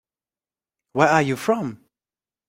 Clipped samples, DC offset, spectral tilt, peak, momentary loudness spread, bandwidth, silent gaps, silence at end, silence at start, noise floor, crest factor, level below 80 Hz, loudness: under 0.1%; under 0.1%; -5.5 dB/octave; -2 dBFS; 13 LU; 16 kHz; none; 0.75 s; 0.95 s; under -90 dBFS; 22 dB; -64 dBFS; -21 LUFS